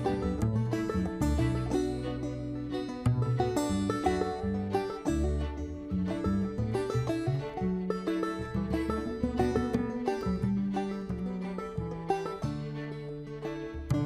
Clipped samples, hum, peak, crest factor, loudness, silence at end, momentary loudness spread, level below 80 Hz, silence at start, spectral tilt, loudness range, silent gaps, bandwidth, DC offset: under 0.1%; none; -14 dBFS; 16 dB; -32 LUFS; 0 s; 7 LU; -42 dBFS; 0 s; -7.5 dB/octave; 3 LU; none; 15 kHz; under 0.1%